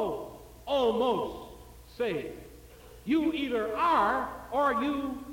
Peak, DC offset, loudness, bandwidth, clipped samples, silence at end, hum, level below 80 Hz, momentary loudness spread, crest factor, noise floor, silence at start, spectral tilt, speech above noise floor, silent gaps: -16 dBFS; under 0.1%; -29 LUFS; 17 kHz; under 0.1%; 0 s; none; -54 dBFS; 19 LU; 14 dB; -51 dBFS; 0 s; -5.5 dB/octave; 22 dB; none